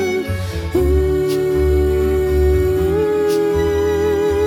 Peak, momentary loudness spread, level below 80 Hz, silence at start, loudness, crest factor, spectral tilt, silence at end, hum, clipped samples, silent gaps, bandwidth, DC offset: -4 dBFS; 4 LU; -24 dBFS; 0 s; -17 LUFS; 12 dB; -7 dB/octave; 0 s; none; under 0.1%; none; 17 kHz; under 0.1%